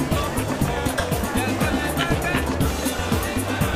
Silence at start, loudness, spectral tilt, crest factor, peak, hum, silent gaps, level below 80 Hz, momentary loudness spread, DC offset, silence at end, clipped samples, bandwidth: 0 s; -23 LUFS; -5 dB/octave; 14 dB; -8 dBFS; none; none; -32 dBFS; 2 LU; under 0.1%; 0 s; under 0.1%; 15.5 kHz